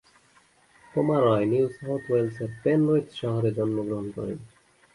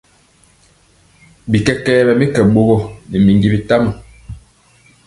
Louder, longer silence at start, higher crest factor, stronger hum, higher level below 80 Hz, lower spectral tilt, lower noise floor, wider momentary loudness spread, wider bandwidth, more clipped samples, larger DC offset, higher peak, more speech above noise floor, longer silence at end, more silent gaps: second, -26 LUFS vs -13 LUFS; second, 0.95 s vs 1.45 s; about the same, 16 dB vs 16 dB; neither; second, -60 dBFS vs -38 dBFS; about the same, -8.5 dB/octave vs -7.5 dB/octave; first, -60 dBFS vs -51 dBFS; second, 11 LU vs 22 LU; about the same, 11.5 kHz vs 11.5 kHz; neither; neither; second, -10 dBFS vs 0 dBFS; about the same, 36 dB vs 39 dB; second, 0.5 s vs 0.7 s; neither